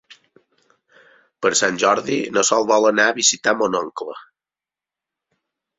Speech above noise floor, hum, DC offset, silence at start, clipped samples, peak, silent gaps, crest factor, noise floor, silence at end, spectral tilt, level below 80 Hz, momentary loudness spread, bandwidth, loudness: 72 dB; none; under 0.1%; 1.4 s; under 0.1%; -2 dBFS; none; 20 dB; -90 dBFS; 1.6 s; -1.5 dB/octave; -66 dBFS; 14 LU; 8.4 kHz; -17 LUFS